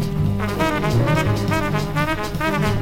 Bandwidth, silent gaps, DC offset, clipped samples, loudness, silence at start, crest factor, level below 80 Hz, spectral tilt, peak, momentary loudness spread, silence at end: 17 kHz; none; under 0.1%; under 0.1%; -20 LUFS; 0 s; 14 dB; -34 dBFS; -6.5 dB/octave; -6 dBFS; 3 LU; 0 s